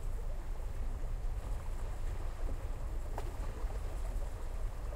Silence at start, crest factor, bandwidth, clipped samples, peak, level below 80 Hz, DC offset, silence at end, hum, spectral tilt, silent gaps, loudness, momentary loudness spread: 0 s; 10 dB; 15 kHz; under 0.1%; -26 dBFS; -38 dBFS; under 0.1%; 0 s; none; -6 dB/octave; none; -44 LUFS; 2 LU